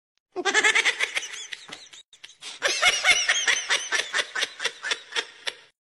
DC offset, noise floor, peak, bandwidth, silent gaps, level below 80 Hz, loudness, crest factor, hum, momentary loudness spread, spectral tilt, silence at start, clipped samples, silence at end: under 0.1%; -48 dBFS; -6 dBFS; 11.5 kHz; 2.05-2.12 s; -64 dBFS; -23 LUFS; 20 dB; none; 19 LU; 2 dB/octave; 0.35 s; under 0.1%; 0.3 s